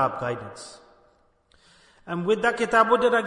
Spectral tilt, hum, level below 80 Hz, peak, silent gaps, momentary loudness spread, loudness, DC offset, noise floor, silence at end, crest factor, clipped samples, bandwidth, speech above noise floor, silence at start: -5 dB/octave; none; -60 dBFS; -6 dBFS; none; 21 LU; -23 LUFS; under 0.1%; -62 dBFS; 0 s; 20 dB; under 0.1%; 11 kHz; 39 dB; 0 s